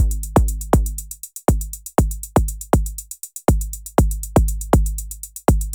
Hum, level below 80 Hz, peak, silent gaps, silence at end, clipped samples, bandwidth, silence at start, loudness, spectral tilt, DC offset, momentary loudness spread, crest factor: none; -22 dBFS; 0 dBFS; none; 0 s; under 0.1%; over 20 kHz; 0 s; -21 LUFS; -6.5 dB/octave; under 0.1%; 10 LU; 18 dB